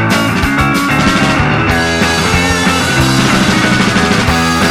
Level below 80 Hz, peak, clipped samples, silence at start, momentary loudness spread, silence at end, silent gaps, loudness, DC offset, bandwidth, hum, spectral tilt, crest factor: -26 dBFS; 0 dBFS; under 0.1%; 0 s; 2 LU; 0 s; none; -10 LUFS; under 0.1%; 18.5 kHz; none; -4.5 dB/octave; 10 dB